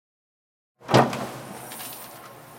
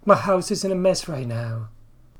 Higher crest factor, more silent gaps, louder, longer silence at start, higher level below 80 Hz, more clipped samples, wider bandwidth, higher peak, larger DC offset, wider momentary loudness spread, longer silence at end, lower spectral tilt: about the same, 24 dB vs 22 dB; neither; second, -25 LUFS vs -22 LUFS; first, 0.8 s vs 0.05 s; second, -60 dBFS vs -48 dBFS; neither; about the same, 17 kHz vs 17 kHz; about the same, -4 dBFS vs -2 dBFS; neither; first, 21 LU vs 14 LU; second, 0 s vs 0.45 s; about the same, -5 dB/octave vs -5.5 dB/octave